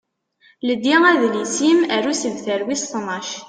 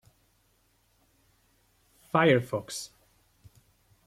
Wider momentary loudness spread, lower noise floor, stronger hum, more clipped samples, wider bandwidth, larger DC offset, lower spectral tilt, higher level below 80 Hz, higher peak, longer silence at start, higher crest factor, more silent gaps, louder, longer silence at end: second, 11 LU vs 16 LU; second, -57 dBFS vs -69 dBFS; neither; neither; second, 9.8 kHz vs 16 kHz; neither; second, -2.5 dB/octave vs -5.5 dB/octave; about the same, -66 dBFS vs -68 dBFS; first, -2 dBFS vs -8 dBFS; second, 0.65 s vs 2.15 s; second, 16 dB vs 24 dB; neither; first, -18 LUFS vs -27 LUFS; second, 0 s vs 1.2 s